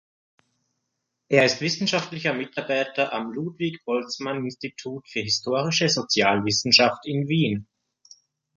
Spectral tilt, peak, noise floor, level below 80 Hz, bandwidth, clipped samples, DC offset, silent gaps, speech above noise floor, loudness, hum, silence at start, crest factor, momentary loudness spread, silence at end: -4 dB/octave; -2 dBFS; -79 dBFS; -64 dBFS; 10.5 kHz; under 0.1%; under 0.1%; none; 56 dB; -23 LUFS; none; 1.3 s; 22 dB; 13 LU; 0.95 s